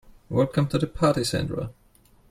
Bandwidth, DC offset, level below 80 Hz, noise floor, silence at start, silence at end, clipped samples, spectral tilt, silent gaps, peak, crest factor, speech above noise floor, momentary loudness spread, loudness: 15.5 kHz; under 0.1%; -48 dBFS; -57 dBFS; 0.3 s; 0.6 s; under 0.1%; -6 dB/octave; none; -8 dBFS; 18 dB; 34 dB; 9 LU; -25 LUFS